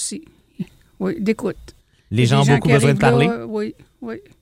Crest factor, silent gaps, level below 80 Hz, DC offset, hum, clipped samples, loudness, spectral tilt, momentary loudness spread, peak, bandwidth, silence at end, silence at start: 18 dB; none; -46 dBFS; under 0.1%; none; under 0.1%; -18 LUFS; -6 dB/octave; 19 LU; 0 dBFS; 13 kHz; 0.2 s; 0 s